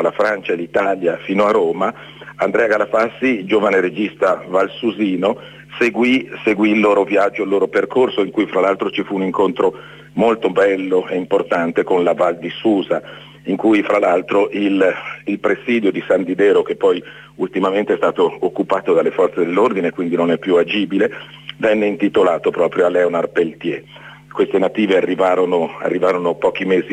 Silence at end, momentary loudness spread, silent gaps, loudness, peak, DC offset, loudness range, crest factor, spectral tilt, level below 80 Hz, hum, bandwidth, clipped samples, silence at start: 0 s; 6 LU; none; -17 LUFS; -4 dBFS; under 0.1%; 1 LU; 14 dB; -6.5 dB/octave; -60 dBFS; none; 9.4 kHz; under 0.1%; 0 s